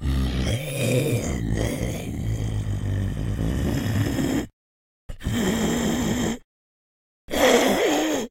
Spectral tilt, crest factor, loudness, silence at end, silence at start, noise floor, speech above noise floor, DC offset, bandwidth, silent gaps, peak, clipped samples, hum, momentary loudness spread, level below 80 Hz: -5 dB/octave; 20 dB; -24 LUFS; 0 s; 0 s; under -90 dBFS; over 66 dB; under 0.1%; 16 kHz; 4.53-5.09 s, 6.44-7.28 s; -4 dBFS; under 0.1%; none; 9 LU; -34 dBFS